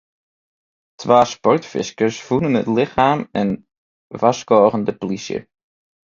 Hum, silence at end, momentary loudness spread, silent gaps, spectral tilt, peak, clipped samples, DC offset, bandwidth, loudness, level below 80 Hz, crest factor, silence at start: none; 0.7 s; 13 LU; 3.78-4.10 s; -6 dB/octave; 0 dBFS; under 0.1%; under 0.1%; 7.6 kHz; -18 LUFS; -54 dBFS; 18 dB; 1 s